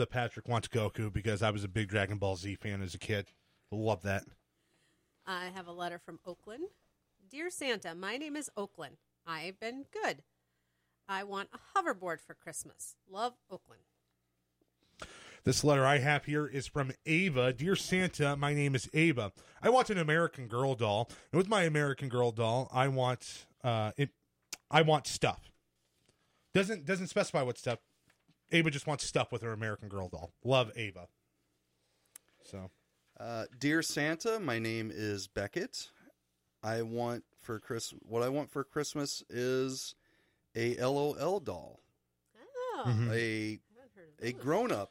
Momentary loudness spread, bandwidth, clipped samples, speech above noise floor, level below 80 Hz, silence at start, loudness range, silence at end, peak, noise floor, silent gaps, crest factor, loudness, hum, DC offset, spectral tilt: 16 LU; 16 kHz; under 0.1%; 47 dB; -64 dBFS; 0 s; 10 LU; 0.05 s; -12 dBFS; -81 dBFS; none; 22 dB; -34 LUFS; 60 Hz at -65 dBFS; under 0.1%; -5 dB/octave